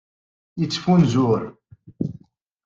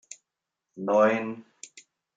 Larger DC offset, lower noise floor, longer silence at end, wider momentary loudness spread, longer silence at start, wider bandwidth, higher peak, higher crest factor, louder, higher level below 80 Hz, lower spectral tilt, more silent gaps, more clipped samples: neither; second, -50 dBFS vs -86 dBFS; first, 0.55 s vs 0.35 s; second, 16 LU vs 25 LU; first, 0.55 s vs 0.1 s; second, 7.6 kHz vs 9.4 kHz; about the same, -6 dBFS vs -8 dBFS; about the same, 16 dB vs 20 dB; first, -21 LUFS vs -25 LUFS; first, -56 dBFS vs -82 dBFS; first, -7 dB/octave vs -5.5 dB/octave; neither; neither